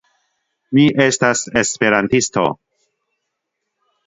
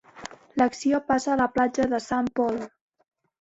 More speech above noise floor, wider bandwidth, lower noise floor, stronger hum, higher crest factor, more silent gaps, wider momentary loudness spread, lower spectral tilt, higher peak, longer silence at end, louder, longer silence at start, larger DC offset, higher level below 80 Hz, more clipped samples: first, 61 dB vs 20 dB; about the same, 8 kHz vs 8 kHz; first, -77 dBFS vs -44 dBFS; neither; about the same, 18 dB vs 18 dB; neither; second, 6 LU vs 14 LU; about the same, -4 dB/octave vs -5 dB/octave; first, 0 dBFS vs -8 dBFS; first, 1.5 s vs 0.75 s; first, -15 LUFS vs -25 LUFS; first, 0.7 s vs 0.15 s; neither; about the same, -54 dBFS vs -58 dBFS; neither